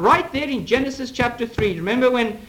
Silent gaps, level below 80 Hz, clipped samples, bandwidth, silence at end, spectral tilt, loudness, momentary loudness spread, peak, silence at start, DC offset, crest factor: none; -44 dBFS; under 0.1%; 17.5 kHz; 0.05 s; -5.5 dB/octave; -21 LUFS; 6 LU; -4 dBFS; 0 s; under 0.1%; 16 dB